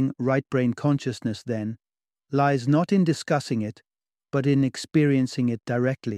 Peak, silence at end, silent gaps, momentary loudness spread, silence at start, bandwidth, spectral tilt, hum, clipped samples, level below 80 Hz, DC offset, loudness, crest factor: -8 dBFS; 0 s; none; 9 LU; 0 s; 11.5 kHz; -7 dB/octave; none; under 0.1%; -66 dBFS; under 0.1%; -24 LUFS; 16 dB